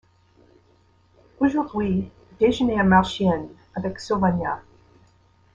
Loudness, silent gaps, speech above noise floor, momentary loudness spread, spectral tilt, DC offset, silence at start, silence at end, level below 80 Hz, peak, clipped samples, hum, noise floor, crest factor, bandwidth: -22 LUFS; none; 38 dB; 13 LU; -7 dB/octave; under 0.1%; 1.4 s; 0.95 s; -48 dBFS; -4 dBFS; under 0.1%; none; -59 dBFS; 20 dB; 7.8 kHz